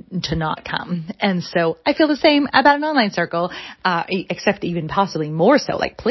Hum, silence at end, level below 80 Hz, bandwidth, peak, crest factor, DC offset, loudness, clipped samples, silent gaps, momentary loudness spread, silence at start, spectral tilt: none; 0 s; -46 dBFS; 6.2 kHz; 0 dBFS; 18 dB; under 0.1%; -19 LUFS; under 0.1%; none; 10 LU; 0.1 s; -5.5 dB/octave